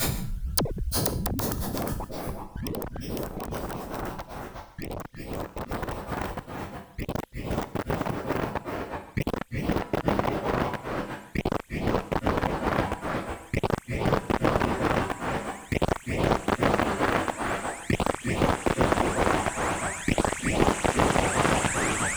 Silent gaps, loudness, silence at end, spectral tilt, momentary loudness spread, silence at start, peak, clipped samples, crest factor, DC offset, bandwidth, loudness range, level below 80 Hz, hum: none; -28 LUFS; 0 s; -5 dB/octave; 11 LU; 0 s; -6 dBFS; under 0.1%; 22 dB; under 0.1%; over 20 kHz; 10 LU; -38 dBFS; none